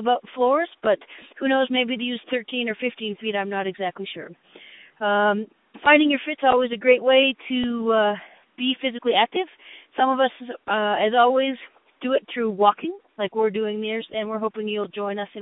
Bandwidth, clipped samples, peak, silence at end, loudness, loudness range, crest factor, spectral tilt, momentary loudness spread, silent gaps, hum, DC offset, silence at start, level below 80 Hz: 4 kHz; under 0.1%; -2 dBFS; 0 s; -22 LUFS; 6 LU; 22 dB; -9 dB/octave; 12 LU; none; none; under 0.1%; 0 s; -68 dBFS